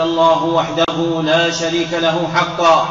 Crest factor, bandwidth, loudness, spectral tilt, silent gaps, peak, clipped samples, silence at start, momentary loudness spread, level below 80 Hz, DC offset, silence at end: 12 dB; 7.8 kHz; -15 LUFS; -3 dB/octave; none; -2 dBFS; under 0.1%; 0 s; 4 LU; -50 dBFS; 0.1%; 0 s